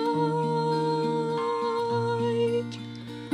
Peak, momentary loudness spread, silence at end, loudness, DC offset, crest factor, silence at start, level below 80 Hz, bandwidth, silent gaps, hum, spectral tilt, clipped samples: -14 dBFS; 11 LU; 0 s; -27 LUFS; under 0.1%; 12 dB; 0 s; -68 dBFS; 11 kHz; none; none; -7 dB/octave; under 0.1%